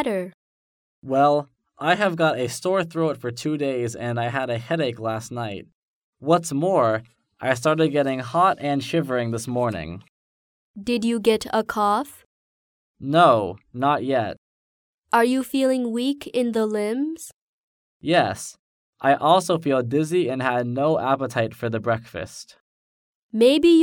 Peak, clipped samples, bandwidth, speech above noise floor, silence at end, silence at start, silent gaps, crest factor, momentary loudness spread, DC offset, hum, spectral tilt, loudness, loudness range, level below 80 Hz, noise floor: -4 dBFS; under 0.1%; 18.5 kHz; over 69 dB; 0 s; 0 s; 0.34-1.02 s, 5.74-6.13 s, 10.09-10.74 s, 12.25-12.95 s, 14.38-15.02 s, 17.36-18.00 s, 18.59-18.93 s, 22.60-23.29 s; 20 dB; 14 LU; under 0.1%; none; -5.5 dB/octave; -22 LUFS; 4 LU; -60 dBFS; under -90 dBFS